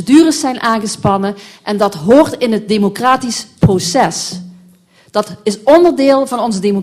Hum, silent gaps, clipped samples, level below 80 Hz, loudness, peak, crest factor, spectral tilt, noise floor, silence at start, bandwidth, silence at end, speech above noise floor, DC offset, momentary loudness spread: none; none; 0.2%; -44 dBFS; -13 LUFS; 0 dBFS; 12 dB; -5 dB/octave; -46 dBFS; 0 s; 15 kHz; 0 s; 34 dB; under 0.1%; 12 LU